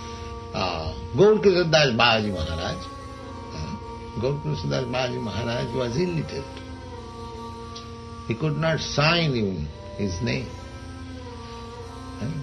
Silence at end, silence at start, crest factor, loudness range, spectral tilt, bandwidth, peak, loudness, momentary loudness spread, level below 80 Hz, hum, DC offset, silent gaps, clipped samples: 0 s; 0 s; 22 dB; 8 LU; -5.5 dB/octave; 10.5 kHz; -4 dBFS; -24 LUFS; 19 LU; -44 dBFS; none; under 0.1%; none; under 0.1%